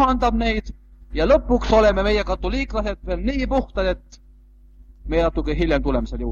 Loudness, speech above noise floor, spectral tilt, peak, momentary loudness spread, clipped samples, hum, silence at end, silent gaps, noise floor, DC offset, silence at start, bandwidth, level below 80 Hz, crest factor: -21 LUFS; 28 dB; -6.5 dB/octave; -4 dBFS; 10 LU; under 0.1%; none; 0 s; none; -48 dBFS; under 0.1%; 0 s; 7.2 kHz; -28 dBFS; 18 dB